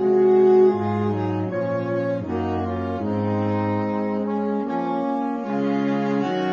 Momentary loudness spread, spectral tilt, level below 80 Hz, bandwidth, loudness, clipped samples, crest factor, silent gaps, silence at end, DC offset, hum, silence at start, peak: 9 LU; -9 dB/octave; -58 dBFS; 6.8 kHz; -22 LUFS; under 0.1%; 14 dB; none; 0 s; under 0.1%; none; 0 s; -8 dBFS